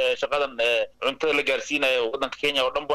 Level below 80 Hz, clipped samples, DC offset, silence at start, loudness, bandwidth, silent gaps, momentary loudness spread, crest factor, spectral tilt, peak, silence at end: -56 dBFS; under 0.1%; under 0.1%; 0 s; -23 LUFS; 15.5 kHz; none; 4 LU; 12 dB; -2 dB/octave; -12 dBFS; 0 s